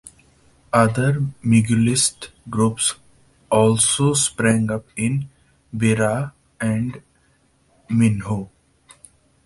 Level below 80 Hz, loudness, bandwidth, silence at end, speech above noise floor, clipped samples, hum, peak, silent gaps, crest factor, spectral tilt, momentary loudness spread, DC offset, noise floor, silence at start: -50 dBFS; -19 LUFS; 11.5 kHz; 1 s; 41 dB; under 0.1%; none; -2 dBFS; none; 20 dB; -4.5 dB/octave; 12 LU; under 0.1%; -60 dBFS; 0.05 s